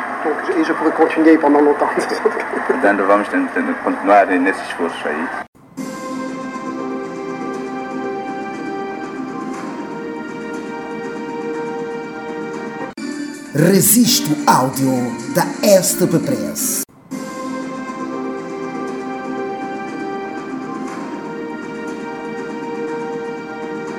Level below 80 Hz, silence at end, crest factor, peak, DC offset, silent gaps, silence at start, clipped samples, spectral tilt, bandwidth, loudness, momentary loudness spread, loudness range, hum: -60 dBFS; 0 s; 18 dB; 0 dBFS; under 0.1%; 5.48-5.53 s; 0 s; under 0.1%; -4 dB/octave; over 20 kHz; -19 LUFS; 14 LU; 11 LU; none